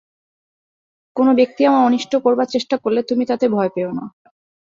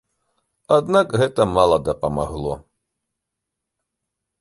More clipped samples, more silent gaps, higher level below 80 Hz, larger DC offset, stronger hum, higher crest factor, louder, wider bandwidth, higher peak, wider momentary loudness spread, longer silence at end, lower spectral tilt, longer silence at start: neither; neither; second, -66 dBFS vs -44 dBFS; neither; neither; about the same, 16 dB vs 20 dB; about the same, -17 LUFS vs -19 LUFS; second, 7.6 kHz vs 11.5 kHz; about the same, -4 dBFS vs -2 dBFS; about the same, 11 LU vs 11 LU; second, 0.6 s vs 1.8 s; about the same, -6 dB/octave vs -6 dB/octave; first, 1.15 s vs 0.7 s